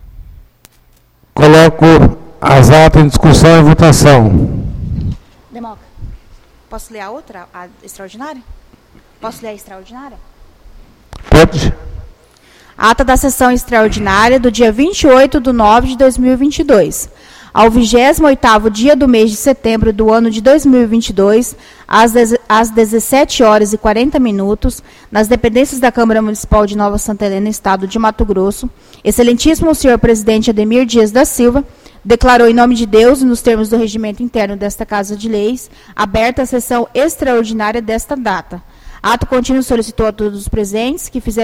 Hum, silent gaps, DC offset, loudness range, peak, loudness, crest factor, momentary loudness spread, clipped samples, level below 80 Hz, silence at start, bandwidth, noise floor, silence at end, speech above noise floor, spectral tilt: none; none; under 0.1%; 15 LU; 0 dBFS; -10 LUFS; 10 dB; 15 LU; 0.8%; -24 dBFS; 0.05 s; 16.5 kHz; -48 dBFS; 0 s; 39 dB; -5.5 dB/octave